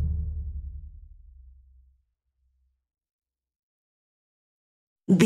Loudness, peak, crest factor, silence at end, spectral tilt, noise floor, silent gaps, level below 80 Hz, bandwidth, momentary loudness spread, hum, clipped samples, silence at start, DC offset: -33 LUFS; -6 dBFS; 26 dB; 0 s; -8 dB/octave; -73 dBFS; 3.13-3.19 s, 3.59-4.96 s; -40 dBFS; 3.5 kHz; 25 LU; none; under 0.1%; 0 s; under 0.1%